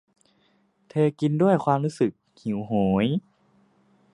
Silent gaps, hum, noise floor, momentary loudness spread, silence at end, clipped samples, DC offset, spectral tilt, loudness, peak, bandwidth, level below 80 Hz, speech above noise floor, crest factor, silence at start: none; none; -65 dBFS; 10 LU; 0.95 s; under 0.1%; under 0.1%; -8 dB/octave; -24 LUFS; -6 dBFS; 11 kHz; -58 dBFS; 42 dB; 18 dB; 0.95 s